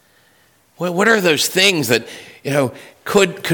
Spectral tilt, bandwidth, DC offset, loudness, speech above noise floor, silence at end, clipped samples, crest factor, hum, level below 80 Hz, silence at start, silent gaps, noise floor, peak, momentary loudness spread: -3.5 dB/octave; 19 kHz; under 0.1%; -16 LUFS; 38 dB; 0 s; under 0.1%; 16 dB; none; -58 dBFS; 0.8 s; none; -55 dBFS; -2 dBFS; 14 LU